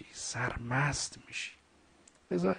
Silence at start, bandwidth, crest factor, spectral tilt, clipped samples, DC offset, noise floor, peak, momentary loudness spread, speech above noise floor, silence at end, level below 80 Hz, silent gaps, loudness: 0 s; 10 kHz; 18 dB; -4 dB/octave; under 0.1%; under 0.1%; -64 dBFS; -18 dBFS; 9 LU; 30 dB; 0 s; -56 dBFS; none; -35 LUFS